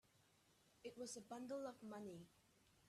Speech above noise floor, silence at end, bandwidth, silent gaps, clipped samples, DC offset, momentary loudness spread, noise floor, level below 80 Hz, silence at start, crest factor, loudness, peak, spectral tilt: 24 dB; 0 s; 14 kHz; none; under 0.1%; under 0.1%; 10 LU; -77 dBFS; -88 dBFS; 0.15 s; 16 dB; -54 LUFS; -40 dBFS; -4 dB/octave